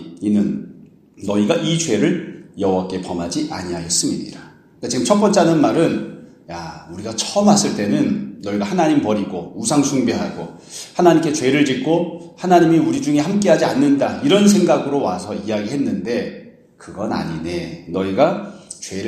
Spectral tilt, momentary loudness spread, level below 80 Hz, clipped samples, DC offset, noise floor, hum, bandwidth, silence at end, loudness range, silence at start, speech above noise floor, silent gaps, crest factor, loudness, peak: -5 dB/octave; 17 LU; -54 dBFS; under 0.1%; under 0.1%; -44 dBFS; none; 13.5 kHz; 0 s; 6 LU; 0 s; 27 dB; none; 18 dB; -18 LUFS; 0 dBFS